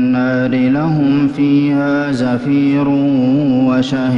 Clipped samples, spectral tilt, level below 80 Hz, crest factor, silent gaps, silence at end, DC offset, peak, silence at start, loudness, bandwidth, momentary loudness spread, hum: under 0.1%; -8 dB/octave; -48 dBFS; 8 dB; none; 0 s; under 0.1%; -4 dBFS; 0 s; -14 LUFS; 7.6 kHz; 2 LU; none